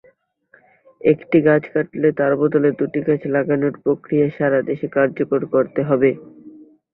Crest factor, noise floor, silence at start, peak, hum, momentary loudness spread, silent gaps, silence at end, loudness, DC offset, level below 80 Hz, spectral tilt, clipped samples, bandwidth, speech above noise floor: 16 dB; -56 dBFS; 1.05 s; -2 dBFS; none; 6 LU; none; 0.45 s; -18 LUFS; under 0.1%; -60 dBFS; -12 dB/octave; under 0.1%; 4 kHz; 38 dB